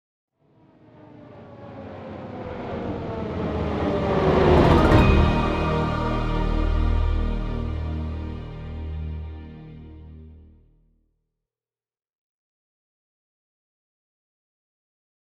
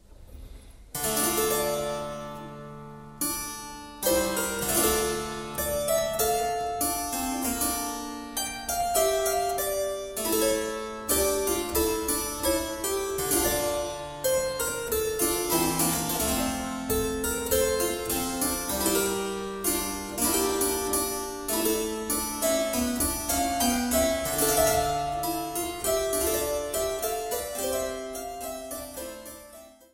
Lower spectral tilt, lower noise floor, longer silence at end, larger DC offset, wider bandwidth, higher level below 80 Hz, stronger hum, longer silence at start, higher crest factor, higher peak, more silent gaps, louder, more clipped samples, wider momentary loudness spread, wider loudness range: first, -8 dB/octave vs -2.5 dB/octave; first, under -90 dBFS vs -49 dBFS; first, 4.85 s vs 0.2 s; neither; second, 8 kHz vs 17 kHz; first, -30 dBFS vs -46 dBFS; neither; first, 1.05 s vs 0.1 s; about the same, 22 dB vs 18 dB; first, -4 dBFS vs -10 dBFS; neither; first, -23 LUFS vs -27 LUFS; neither; first, 25 LU vs 10 LU; first, 18 LU vs 4 LU